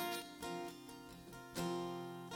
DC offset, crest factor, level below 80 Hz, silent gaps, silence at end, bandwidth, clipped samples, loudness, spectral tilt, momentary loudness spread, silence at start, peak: under 0.1%; 18 dB; -70 dBFS; none; 0 s; 17.5 kHz; under 0.1%; -46 LUFS; -4.5 dB/octave; 12 LU; 0 s; -28 dBFS